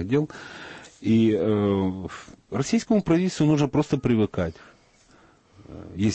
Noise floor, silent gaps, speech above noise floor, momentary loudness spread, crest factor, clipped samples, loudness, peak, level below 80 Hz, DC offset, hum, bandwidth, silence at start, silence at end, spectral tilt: -57 dBFS; none; 33 dB; 19 LU; 14 dB; under 0.1%; -23 LUFS; -10 dBFS; -52 dBFS; under 0.1%; none; 8.6 kHz; 0 s; 0 s; -7 dB/octave